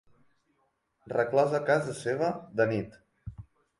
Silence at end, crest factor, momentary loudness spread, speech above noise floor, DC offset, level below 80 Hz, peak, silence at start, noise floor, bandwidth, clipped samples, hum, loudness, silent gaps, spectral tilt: 0.4 s; 20 dB; 21 LU; 47 dB; under 0.1%; -60 dBFS; -12 dBFS; 1.05 s; -75 dBFS; 11.5 kHz; under 0.1%; none; -29 LUFS; none; -6.5 dB/octave